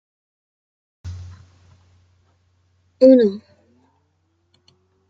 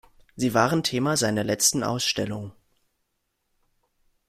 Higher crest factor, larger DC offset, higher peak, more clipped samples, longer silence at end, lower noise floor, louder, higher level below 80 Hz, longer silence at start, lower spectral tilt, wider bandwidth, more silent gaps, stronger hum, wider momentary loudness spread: about the same, 22 dB vs 22 dB; neither; first, -2 dBFS vs -6 dBFS; neither; about the same, 1.75 s vs 1.8 s; second, -66 dBFS vs -76 dBFS; first, -14 LUFS vs -23 LUFS; about the same, -60 dBFS vs -60 dBFS; first, 1.05 s vs 0.35 s; first, -8.5 dB/octave vs -3.5 dB/octave; second, 6.6 kHz vs 16 kHz; neither; neither; first, 27 LU vs 10 LU